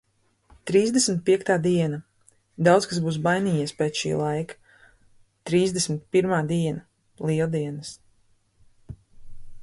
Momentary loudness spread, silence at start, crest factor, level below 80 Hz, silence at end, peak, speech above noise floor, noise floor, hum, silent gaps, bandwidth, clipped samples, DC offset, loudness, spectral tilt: 14 LU; 0.65 s; 18 dB; -56 dBFS; 0 s; -6 dBFS; 40 dB; -63 dBFS; none; none; 11.5 kHz; under 0.1%; under 0.1%; -24 LUFS; -5 dB/octave